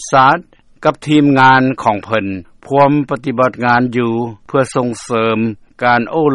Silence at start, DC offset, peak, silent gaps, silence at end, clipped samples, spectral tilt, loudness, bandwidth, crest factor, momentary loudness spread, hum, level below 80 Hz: 0 s; under 0.1%; 0 dBFS; none; 0 s; under 0.1%; -6 dB/octave; -14 LUFS; 11.5 kHz; 14 dB; 10 LU; none; -50 dBFS